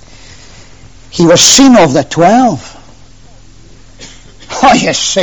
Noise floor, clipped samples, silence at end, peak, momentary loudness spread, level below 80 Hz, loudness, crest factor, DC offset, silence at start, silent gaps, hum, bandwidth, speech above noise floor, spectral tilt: -38 dBFS; 0.7%; 0 s; 0 dBFS; 16 LU; -38 dBFS; -6 LUFS; 10 dB; 1%; 1.15 s; none; none; over 20 kHz; 32 dB; -3 dB/octave